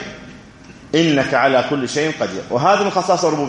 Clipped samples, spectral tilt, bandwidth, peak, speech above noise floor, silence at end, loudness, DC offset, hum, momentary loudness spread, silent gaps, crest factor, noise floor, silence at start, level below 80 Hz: under 0.1%; -4.5 dB/octave; 10.5 kHz; -2 dBFS; 24 dB; 0 s; -17 LUFS; under 0.1%; none; 7 LU; none; 16 dB; -40 dBFS; 0 s; -54 dBFS